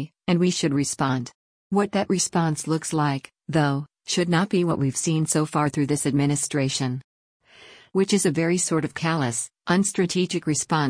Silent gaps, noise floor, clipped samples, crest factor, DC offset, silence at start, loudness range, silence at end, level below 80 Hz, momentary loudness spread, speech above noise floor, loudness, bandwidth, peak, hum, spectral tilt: 1.35-1.70 s, 7.04-7.40 s; -50 dBFS; under 0.1%; 16 dB; under 0.1%; 0 s; 2 LU; 0 s; -60 dBFS; 5 LU; 27 dB; -23 LUFS; 10.5 kHz; -8 dBFS; none; -4.5 dB/octave